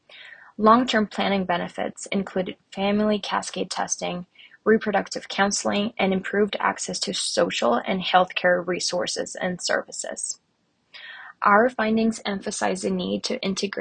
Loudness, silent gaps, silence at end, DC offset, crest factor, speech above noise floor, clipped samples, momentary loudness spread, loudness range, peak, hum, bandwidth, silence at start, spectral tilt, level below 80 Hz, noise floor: -24 LUFS; none; 0 s; under 0.1%; 22 dB; 46 dB; under 0.1%; 12 LU; 3 LU; -2 dBFS; none; 10 kHz; 0.1 s; -3.5 dB/octave; -62 dBFS; -69 dBFS